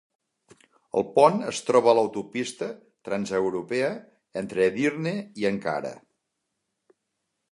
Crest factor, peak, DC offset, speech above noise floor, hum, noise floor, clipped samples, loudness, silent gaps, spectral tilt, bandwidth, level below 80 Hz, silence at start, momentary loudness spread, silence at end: 22 dB; -4 dBFS; under 0.1%; 56 dB; none; -80 dBFS; under 0.1%; -25 LUFS; none; -5 dB/octave; 11.5 kHz; -68 dBFS; 0.95 s; 15 LU; 1.55 s